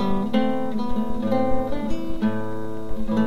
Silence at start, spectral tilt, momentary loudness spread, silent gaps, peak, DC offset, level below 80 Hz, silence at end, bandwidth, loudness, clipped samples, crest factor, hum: 0 s; -8 dB/octave; 9 LU; none; -8 dBFS; 6%; -36 dBFS; 0 s; 12.5 kHz; -26 LUFS; under 0.1%; 14 dB; none